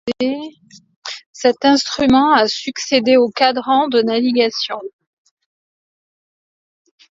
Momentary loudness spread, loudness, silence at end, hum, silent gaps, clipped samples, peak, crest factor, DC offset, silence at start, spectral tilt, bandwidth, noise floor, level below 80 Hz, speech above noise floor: 17 LU; -15 LUFS; 2.3 s; none; 0.96-1.02 s, 1.26-1.34 s; under 0.1%; 0 dBFS; 18 dB; under 0.1%; 0.05 s; -3.5 dB/octave; 7.8 kHz; under -90 dBFS; -54 dBFS; over 75 dB